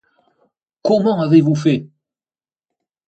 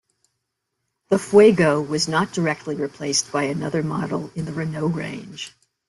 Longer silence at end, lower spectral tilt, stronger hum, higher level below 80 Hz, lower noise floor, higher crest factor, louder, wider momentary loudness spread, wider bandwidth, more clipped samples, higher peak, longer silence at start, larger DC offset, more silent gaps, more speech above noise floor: first, 1.25 s vs 0.4 s; first, -8 dB/octave vs -5 dB/octave; neither; second, -64 dBFS vs -58 dBFS; first, under -90 dBFS vs -78 dBFS; about the same, 18 dB vs 18 dB; first, -16 LUFS vs -21 LUFS; second, 9 LU vs 16 LU; second, 8.2 kHz vs 12 kHz; neither; about the same, -2 dBFS vs -4 dBFS; second, 0.85 s vs 1.1 s; neither; neither; first, over 76 dB vs 57 dB